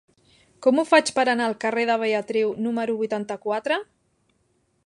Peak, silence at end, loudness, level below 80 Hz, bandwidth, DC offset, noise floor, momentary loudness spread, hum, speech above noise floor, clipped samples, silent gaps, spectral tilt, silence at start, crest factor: -4 dBFS; 1.05 s; -23 LUFS; -72 dBFS; 11 kHz; under 0.1%; -68 dBFS; 9 LU; none; 46 dB; under 0.1%; none; -3.5 dB/octave; 0.6 s; 20 dB